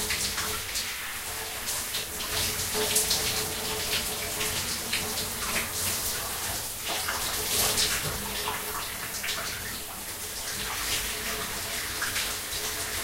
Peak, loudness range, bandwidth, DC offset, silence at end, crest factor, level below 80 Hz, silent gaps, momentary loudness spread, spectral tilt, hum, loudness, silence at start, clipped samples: -10 dBFS; 4 LU; 16 kHz; under 0.1%; 0 s; 20 dB; -48 dBFS; none; 7 LU; -1 dB/octave; none; -28 LUFS; 0 s; under 0.1%